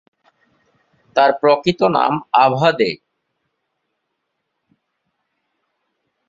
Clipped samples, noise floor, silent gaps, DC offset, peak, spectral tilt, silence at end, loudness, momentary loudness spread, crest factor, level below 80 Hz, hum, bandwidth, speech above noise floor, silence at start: under 0.1%; -74 dBFS; none; under 0.1%; -2 dBFS; -6.5 dB/octave; 3.35 s; -16 LUFS; 7 LU; 18 dB; -62 dBFS; none; 7.6 kHz; 60 dB; 1.15 s